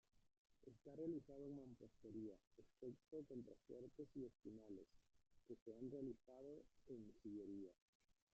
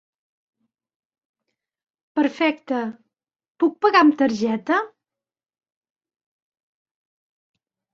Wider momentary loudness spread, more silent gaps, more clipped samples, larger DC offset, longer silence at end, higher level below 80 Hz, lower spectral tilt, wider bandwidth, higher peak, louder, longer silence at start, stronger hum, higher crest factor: about the same, 10 LU vs 12 LU; first, 0.37-0.45 s, 2.47-2.51 s, 5.62-5.66 s, 7.82-8.00 s vs 3.50-3.55 s; neither; neither; second, 0.25 s vs 3.05 s; second, -80 dBFS vs -72 dBFS; first, -10 dB/octave vs -5 dB/octave; about the same, 7.6 kHz vs 7.2 kHz; second, -40 dBFS vs -2 dBFS; second, -58 LUFS vs -20 LUFS; second, 0.15 s vs 2.15 s; neither; about the same, 18 dB vs 22 dB